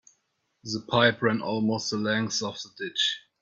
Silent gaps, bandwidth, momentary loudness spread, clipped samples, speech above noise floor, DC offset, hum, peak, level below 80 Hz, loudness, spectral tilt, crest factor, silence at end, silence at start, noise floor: none; 7.8 kHz; 12 LU; under 0.1%; 48 dB; under 0.1%; none; -6 dBFS; -64 dBFS; -26 LUFS; -4 dB/octave; 22 dB; 0.2 s; 0.65 s; -75 dBFS